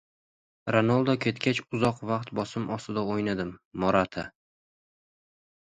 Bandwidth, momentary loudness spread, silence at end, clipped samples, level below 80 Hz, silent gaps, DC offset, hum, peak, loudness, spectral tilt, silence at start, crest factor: 11 kHz; 10 LU; 1.3 s; under 0.1%; -58 dBFS; 3.65-3.71 s; under 0.1%; none; -8 dBFS; -28 LUFS; -6.5 dB/octave; 0.65 s; 22 dB